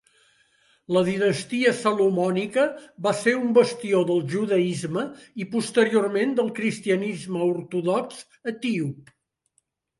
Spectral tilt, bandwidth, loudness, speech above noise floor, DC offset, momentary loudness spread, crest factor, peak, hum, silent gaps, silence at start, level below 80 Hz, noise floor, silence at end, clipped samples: -5.5 dB/octave; 11.5 kHz; -24 LUFS; 48 dB; under 0.1%; 9 LU; 18 dB; -6 dBFS; none; none; 0.9 s; -68 dBFS; -71 dBFS; 1 s; under 0.1%